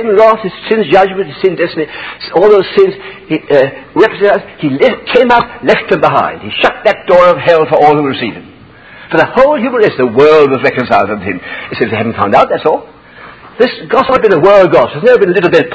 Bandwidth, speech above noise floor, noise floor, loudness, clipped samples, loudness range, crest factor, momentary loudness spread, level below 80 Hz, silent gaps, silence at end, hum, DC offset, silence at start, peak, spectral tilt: 8 kHz; 26 dB; -35 dBFS; -9 LUFS; 2%; 2 LU; 10 dB; 9 LU; -44 dBFS; none; 0 s; none; under 0.1%; 0 s; 0 dBFS; -7 dB/octave